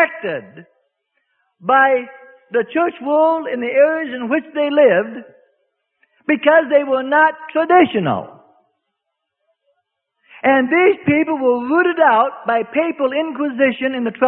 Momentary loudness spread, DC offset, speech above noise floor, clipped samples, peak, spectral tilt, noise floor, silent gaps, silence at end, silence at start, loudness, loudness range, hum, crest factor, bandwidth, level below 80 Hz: 9 LU; under 0.1%; 61 dB; under 0.1%; 0 dBFS; -10.5 dB/octave; -77 dBFS; none; 0 s; 0 s; -16 LUFS; 4 LU; none; 18 dB; 4.2 kHz; -64 dBFS